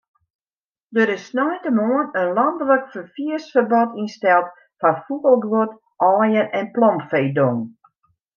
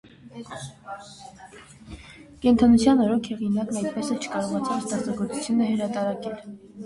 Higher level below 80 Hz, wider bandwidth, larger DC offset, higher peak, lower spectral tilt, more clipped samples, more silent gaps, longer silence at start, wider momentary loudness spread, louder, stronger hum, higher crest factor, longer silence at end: second, -74 dBFS vs -50 dBFS; second, 7 kHz vs 11.5 kHz; neither; first, -4 dBFS vs -8 dBFS; first, -7.5 dB/octave vs -5.5 dB/octave; neither; neither; first, 0.9 s vs 0.25 s; second, 9 LU vs 25 LU; first, -19 LUFS vs -24 LUFS; neither; about the same, 16 dB vs 18 dB; first, 0.65 s vs 0 s